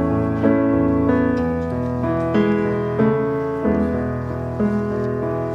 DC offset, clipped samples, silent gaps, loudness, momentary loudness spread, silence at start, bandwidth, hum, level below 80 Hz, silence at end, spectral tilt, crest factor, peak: under 0.1%; under 0.1%; none; -20 LUFS; 5 LU; 0 s; 7.4 kHz; none; -38 dBFS; 0 s; -9.5 dB/octave; 14 dB; -4 dBFS